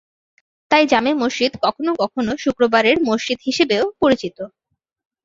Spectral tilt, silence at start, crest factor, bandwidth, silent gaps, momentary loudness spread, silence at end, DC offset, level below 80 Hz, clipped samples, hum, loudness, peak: -4 dB/octave; 0.7 s; 18 dB; 7.8 kHz; none; 7 LU; 0.75 s; under 0.1%; -54 dBFS; under 0.1%; none; -18 LUFS; -2 dBFS